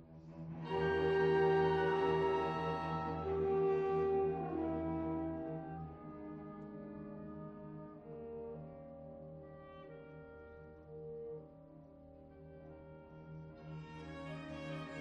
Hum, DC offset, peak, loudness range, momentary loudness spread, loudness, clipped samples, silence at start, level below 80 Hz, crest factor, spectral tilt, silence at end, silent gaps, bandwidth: none; under 0.1%; -22 dBFS; 19 LU; 22 LU; -38 LUFS; under 0.1%; 0 s; -62 dBFS; 18 dB; -8 dB/octave; 0 s; none; 6.4 kHz